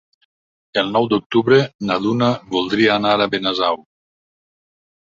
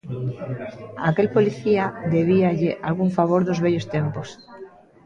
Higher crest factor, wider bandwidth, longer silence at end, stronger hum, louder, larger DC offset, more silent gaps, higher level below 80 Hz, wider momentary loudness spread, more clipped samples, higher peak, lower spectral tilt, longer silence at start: about the same, 18 dB vs 16 dB; about the same, 7.6 kHz vs 7.4 kHz; first, 1.35 s vs 0.4 s; neither; first, -18 LUFS vs -22 LUFS; neither; first, 1.26-1.30 s, 1.75-1.79 s vs none; about the same, -58 dBFS vs -56 dBFS; second, 7 LU vs 15 LU; neither; first, -2 dBFS vs -6 dBFS; second, -6 dB/octave vs -8 dB/octave; first, 0.75 s vs 0.05 s